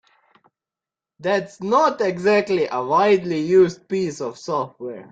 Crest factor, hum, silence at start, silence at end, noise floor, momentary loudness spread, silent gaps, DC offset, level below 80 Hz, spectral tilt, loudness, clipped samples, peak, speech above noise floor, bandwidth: 16 dB; none; 1.2 s; 0.1 s; -89 dBFS; 10 LU; none; under 0.1%; -64 dBFS; -6 dB/octave; -20 LUFS; under 0.1%; -4 dBFS; 70 dB; 7.8 kHz